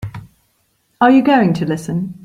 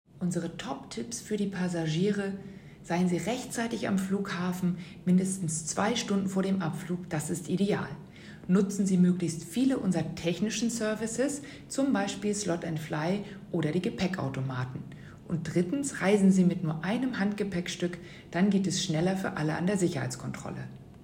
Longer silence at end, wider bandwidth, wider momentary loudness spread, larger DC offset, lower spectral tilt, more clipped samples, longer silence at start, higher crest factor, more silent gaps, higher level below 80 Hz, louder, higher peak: about the same, 0.1 s vs 0 s; second, 12 kHz vs 16 kHz; about the same, 12 LU vs 11 LU; neither; first, -7 dB/octave vs -5.5 dB/octave; neither; second, 0 s vs 0.15 s; about the same, 14 dB vs 16 dB; neither; first, -50 dBFS vs -60 dBFS; first, -14 LUFS vs -30 LUFS; first, -2 dBFS vs -12 dBFS